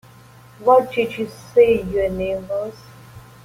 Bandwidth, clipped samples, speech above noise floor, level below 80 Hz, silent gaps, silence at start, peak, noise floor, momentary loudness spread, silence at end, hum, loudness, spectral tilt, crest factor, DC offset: 15.5 kHz; under 0.1%; 27 dB; -46 dBFS; none; 0.6 s; -2 dBFS; -45 dBFS; 12 LU; 0.25 s; none; -19 LUFS; -6.5 dB/octave; 18 dB; under 0.1%